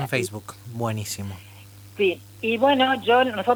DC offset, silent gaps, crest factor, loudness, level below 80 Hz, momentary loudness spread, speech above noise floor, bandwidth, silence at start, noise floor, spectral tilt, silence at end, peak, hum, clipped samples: under 0.1%; none; 18 dB; -23 LUFS; -64 dBFS; 19 LU; 22 dB; over 20 kHz; 0 s; -45 dBFS; -4.5 dB/octave; 0 s; -6 dBFS; 50 Hz at -45 dBFS; under 0.1%